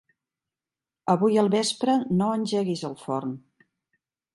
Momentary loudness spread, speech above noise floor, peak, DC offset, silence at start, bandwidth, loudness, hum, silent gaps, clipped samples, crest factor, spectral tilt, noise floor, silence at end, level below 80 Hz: 12 LU; over 66 dB; -8 dBFS; under 0.1%; 1.05 s; 11.5 kHz; -25 LUFS; none; none; under 0.1%; 20 dB; -5.5 dB/octave; under -90 dBFS; 0.95 s; -72 dBFS